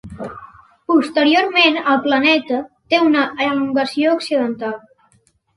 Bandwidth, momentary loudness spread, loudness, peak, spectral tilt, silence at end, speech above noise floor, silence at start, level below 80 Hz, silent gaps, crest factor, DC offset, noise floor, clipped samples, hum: 11.5 kHz; 16 LU; -16 LUFS; -2 dBFS; -4.5 dB/octave; 0.8 s; 43 dB; 0.05 s; -56 dBFS; none; 16 dB; under 0.1%; -59 dBFS; under 0.1%; none